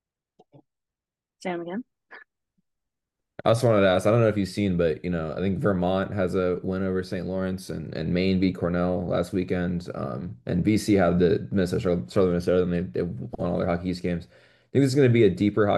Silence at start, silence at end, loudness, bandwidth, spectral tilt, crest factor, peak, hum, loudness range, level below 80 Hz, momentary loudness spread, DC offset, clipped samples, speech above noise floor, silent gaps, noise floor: 1.4 s; 0 s; -25 LUFS; 12.5 kHz; -7.5 dB/octave; 20 dB; -6 dBFS; none; 3 LU; -56 dBFS; 12 LU; under 0.1%; under 0.1%; 66 dB; none; -90 dBFS